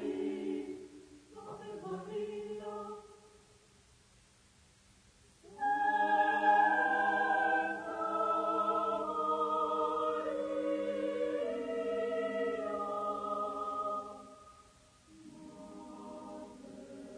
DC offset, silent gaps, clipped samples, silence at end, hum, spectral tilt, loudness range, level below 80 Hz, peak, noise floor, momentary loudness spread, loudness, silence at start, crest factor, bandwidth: under 0.1%; none; under 0.1%; 0 s; none; -5 dB/octave; 15 LU; -72 dBFS; -18 dBFS; -65 dBFS; 21 LU; -34 LUFS; 0 s; 18 dB; 10.5 kHz